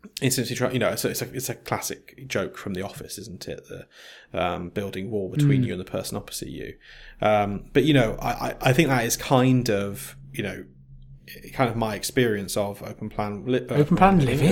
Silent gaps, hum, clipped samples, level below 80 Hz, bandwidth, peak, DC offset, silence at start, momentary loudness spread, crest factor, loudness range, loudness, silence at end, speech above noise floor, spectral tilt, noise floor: none; none; under 0.1%; -46 dBFS; 17 kHz; -2 dBFS; under 0.1%; 0.05 s; 17 LU; 22 dB; 9 LU; -24 LUFS; 0 s; 22 dB; -5.5 dB/octave; -46 dBFS